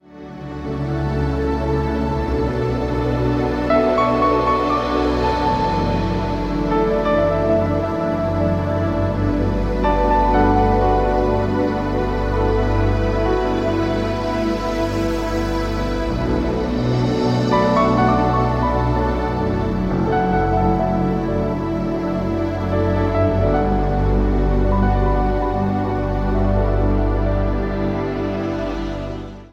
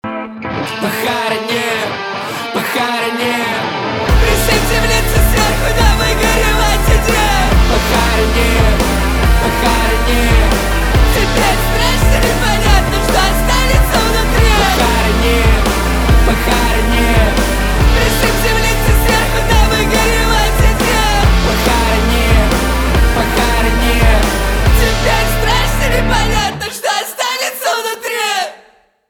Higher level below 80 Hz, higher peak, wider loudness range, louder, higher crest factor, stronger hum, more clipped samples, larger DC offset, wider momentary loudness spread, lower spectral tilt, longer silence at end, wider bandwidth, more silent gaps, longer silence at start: second, -26 dBFS vs -16 dBFS; second, -4 dBFS vs 0 dBFS; about the same, 3 LU vs 3 LU; second, -19 LUFS vs -13 LUFS; about the same, 14 dB vs 12 dB; neither; neither; neither; about the same, 6 LU vs 5 LU; first, -8 dB/octave vs -4 dB/octave; second, 0.05 s vs 0.55 s; second, 8.4 kHz vs 18.5 kHz; neither; about the same, 0.1 s vs 0.05 s